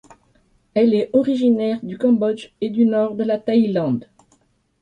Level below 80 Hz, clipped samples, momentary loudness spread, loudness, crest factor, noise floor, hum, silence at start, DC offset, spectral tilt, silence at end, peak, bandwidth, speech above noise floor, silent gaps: -62 dBFS; under 0.1%; 7 LU; -19 LUFS; 14 dB; -61 dBFS; none; 0.75 s; under 0.1%; -8 dB/octave; 0.8 s; -4 dBFS; 8.8 kHz; 43 dB; none